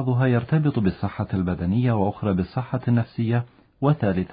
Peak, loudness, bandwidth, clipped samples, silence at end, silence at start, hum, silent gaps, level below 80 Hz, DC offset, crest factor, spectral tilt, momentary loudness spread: -6 dBFS; -23 LUFS; 5 kHz; under 0.1%; 0 s; 0 s; none; none; -42 dBFS; under 0.1%; 16 dB; -13 dB/octave; 6 LU